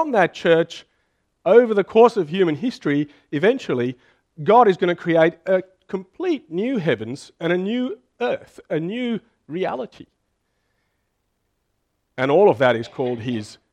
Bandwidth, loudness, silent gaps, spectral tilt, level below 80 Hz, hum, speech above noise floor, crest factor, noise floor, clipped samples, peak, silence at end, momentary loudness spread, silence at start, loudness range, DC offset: 9.4 kHz; -20 LUFS; none; -7 dB/octave; -66 dBFS; none; 52 dB; 20 dB; -72 dBFS; under 0.1%; 0 dBFS; 0.2 s; 15 LU; 0 s; 10 LU; under 0.1%